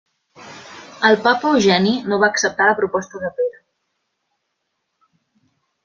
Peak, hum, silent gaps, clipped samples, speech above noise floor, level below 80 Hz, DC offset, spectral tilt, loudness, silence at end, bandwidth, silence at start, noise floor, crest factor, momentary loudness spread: -2 dBFS; none; none; under 0.1%; 57 dB; -62 dBFS; under 0.1%; -4 dB/octave; -17 LUFS; 2.35 s; 7.6 kHz; 0.4 s; -74 dBFS; 20 dB; 21 LU